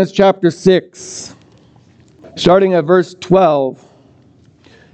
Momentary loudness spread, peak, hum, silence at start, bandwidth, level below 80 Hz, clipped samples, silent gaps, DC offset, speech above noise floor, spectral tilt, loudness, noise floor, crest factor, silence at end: 18 LU; 0 dBFS; none; 0 s; 8.8 kHz; -48 dBFS; under 0.1%; none; under 0.1%; 35 dB; -6 dB/octave; -13 LUFS; -48 dBFS; 14 dB; 1.2 s